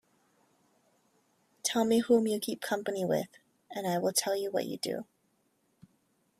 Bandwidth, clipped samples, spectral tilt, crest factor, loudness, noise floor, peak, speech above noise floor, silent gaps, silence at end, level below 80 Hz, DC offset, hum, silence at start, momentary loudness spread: 16 kHz; under 0.1%; -4 dB/octave; 20 dB; -31 LUFS; -74 dBFS; -12 dBFS; 43 dB; none; 1.35 s; -78 dBFS; under 0.1%; none; 1.65 s; 10 LU